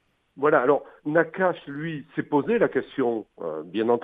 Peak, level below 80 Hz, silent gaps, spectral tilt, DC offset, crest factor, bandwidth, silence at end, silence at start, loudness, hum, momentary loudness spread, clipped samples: -6 dBFS; -66 dBFS; none; -9 dB/octave; under 0.1%; 18 dB; 3.9 kHz; 0 s; 0.35 s; -25 LUFS; none; 12 LU; under 0.1%